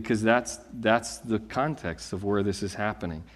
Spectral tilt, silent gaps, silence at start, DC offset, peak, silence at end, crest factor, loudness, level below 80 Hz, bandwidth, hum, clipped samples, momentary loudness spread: -5 dB/octave; none; 0 s; under 0.1%; -6 dBFS; 0 s; 22 dB; -28 LUFS; -54 dBFS; 13.5 kHz; none; under 0.1%; 10 LU